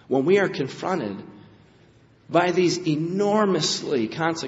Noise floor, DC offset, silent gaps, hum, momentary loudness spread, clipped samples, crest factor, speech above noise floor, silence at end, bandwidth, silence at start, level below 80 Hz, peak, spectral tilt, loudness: -55 dBFS; under 0.1%; none; none; 8 LU; under 0.1%; 20 dB; 32 dB; 0 s; 8 kHz; 0.1 s; -66 dBFS; -4 dBFS; -4 dB/octave; -23 LUFS